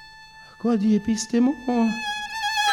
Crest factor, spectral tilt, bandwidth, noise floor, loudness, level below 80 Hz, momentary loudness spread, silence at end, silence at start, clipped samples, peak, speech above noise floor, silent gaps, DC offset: 14 dB; -4 dB/octave; 17 kHz; -46 dBFS; -23 LUFS; -56 dBFS; 6 LU; 0 s; 0 s; under 0.1%; -8 dBFS; 25 dB; none; under 0.1%